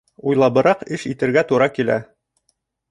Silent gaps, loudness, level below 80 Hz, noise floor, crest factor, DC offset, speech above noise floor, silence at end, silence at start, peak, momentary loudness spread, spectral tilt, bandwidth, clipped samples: none; -18 LUFS; -58 dBFS; -69 dBFS; 16 dB; under 0.1%; 52 dB; 0.9 s; 0.25 s; -2 dBFS; 8 LU; -6.5 dB/octave; 11.5 kHz; under 0.1%